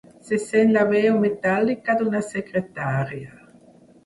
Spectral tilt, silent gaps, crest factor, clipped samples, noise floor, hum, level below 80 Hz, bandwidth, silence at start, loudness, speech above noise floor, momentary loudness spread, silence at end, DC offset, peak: -7 dB/octave; none; 16 dB; under 0.1%; -51 dBFS; none; -60 dBFS; 11.5 kHz; 0.25 s; -22 LUFS; 30 dB; 9 LU; 0.75 s; under 0.1%; -6 dBFS